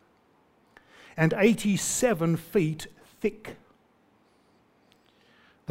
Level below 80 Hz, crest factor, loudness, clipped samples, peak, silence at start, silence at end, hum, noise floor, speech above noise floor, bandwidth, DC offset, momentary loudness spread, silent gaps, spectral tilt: -60 dBFS; 22 dB; -26 LUFS; under 0.1%; -8 dBFS; 1.15 s; 2.15 s; none; -64 dBFS; 39 dB; 16 kHz; under 0.1%; 22 LU; none; -5 dB/octave